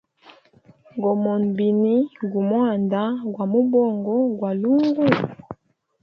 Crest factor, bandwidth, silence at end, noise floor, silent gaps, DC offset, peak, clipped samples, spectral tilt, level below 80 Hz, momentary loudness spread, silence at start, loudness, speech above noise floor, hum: 20 dB; 5.8 kHz; 0.5 s; -54 dBFS; none; under 0.1%; 0 dBFS; under 0.1%; -9.5 dB/octave; -64 dBFS; 8 LU; 0.95 s; -21 LUFS; 34 dB; none